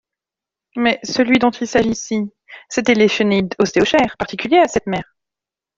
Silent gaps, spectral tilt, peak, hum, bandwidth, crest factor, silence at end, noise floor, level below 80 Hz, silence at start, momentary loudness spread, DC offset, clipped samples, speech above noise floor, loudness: none; -4.5 dB/octave; -2 dBFS; none; 7.8 kHz; 16 dB; 0.75 s; -87 dBFS; -50 dBFS; 0.75 s; 10 LU; under 0.1%; under 0.1%; 71 dB; -17 LUFS